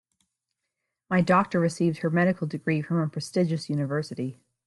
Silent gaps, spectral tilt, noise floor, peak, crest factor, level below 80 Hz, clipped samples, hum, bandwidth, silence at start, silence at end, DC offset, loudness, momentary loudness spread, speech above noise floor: none; -7 dB/octave; -83 dBFS; -8 dBFS; 18 dB; -66 dBFS; under 0.1%; none; 11.5 kHz; 1.1 s; 0.35 s; under 0.1%; -26 LUFS; 8 LU; 58 dB